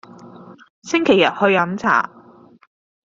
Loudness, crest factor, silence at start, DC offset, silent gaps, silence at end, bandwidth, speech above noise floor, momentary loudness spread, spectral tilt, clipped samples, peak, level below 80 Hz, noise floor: -17 LUFS; 18 dB; 0.25 s; under 0.1%; 0.70-0.82 s; 1 s; 7.6 kHz; 31 dB; 12 LU; -5 dB/octave; under 0.1%; -2 dBFS; -60 dBFS; -47 dBFS